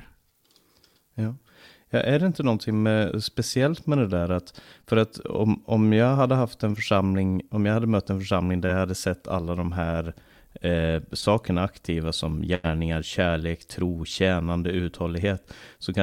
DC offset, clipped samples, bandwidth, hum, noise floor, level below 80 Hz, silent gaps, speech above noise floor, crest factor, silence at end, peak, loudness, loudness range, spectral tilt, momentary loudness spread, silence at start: under 0.1%; under 0.1%; 16 kHz; none; -63 dBFS; -44 dBFS; none; 39 dB; 18 dB; 0 s; -8 dBFS; -25 LUFS; 4 LU; -6.5 dB/octave; 7 LU; 0 s